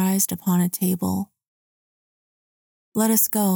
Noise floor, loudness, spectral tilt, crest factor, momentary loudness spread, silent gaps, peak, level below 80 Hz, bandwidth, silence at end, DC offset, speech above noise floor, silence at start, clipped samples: under -90 dBFS; -21 LUFS; -5 dB/octave; 18 dB; 11 LU; 1.48-2.92 s; -6 dBFS; -66 dBFS; over 20 kHz; 0 s; under 0.1%; over 69 dB; 0 s; under 0.1%